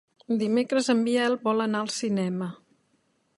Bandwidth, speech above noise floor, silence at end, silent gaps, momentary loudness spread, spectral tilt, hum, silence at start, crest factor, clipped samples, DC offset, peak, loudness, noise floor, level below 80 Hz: 11.5 kHz; 45 dB; 0.8 s; none; 7 LU; -5 dB/octave; none; 0.3 s; 16 dB; under 0.1%; under 0.1%; -10 dBFS; -26 LUFS; -70 dBFS; -76 dBFS